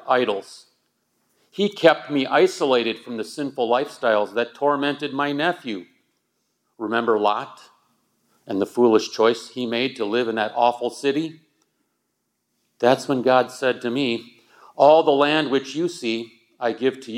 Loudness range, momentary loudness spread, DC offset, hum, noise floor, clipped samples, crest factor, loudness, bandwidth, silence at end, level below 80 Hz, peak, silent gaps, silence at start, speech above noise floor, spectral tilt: 5 LU; 12 LU; under 0.1%; none; -75 dBFS; under 0.1%; 20 dB; -21 LUFS; 14.5 kHz; 0 s; -82 dBFS; -2 dBFS; none; 0.05 s; 54 dB; -4.5 dB/octave